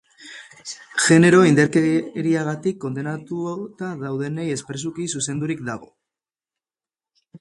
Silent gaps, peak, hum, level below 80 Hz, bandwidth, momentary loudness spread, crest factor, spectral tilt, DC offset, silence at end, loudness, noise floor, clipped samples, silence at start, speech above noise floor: none; -2 dBFS; none; -62 dBFS; 11.5 kHz; 21 LU; 20 dB; -5 dB/octave; under 0.1%; 0.05 s; -20 LUFS; under -90 dBFS; under 0.1%; 0.2 s; over 70 dB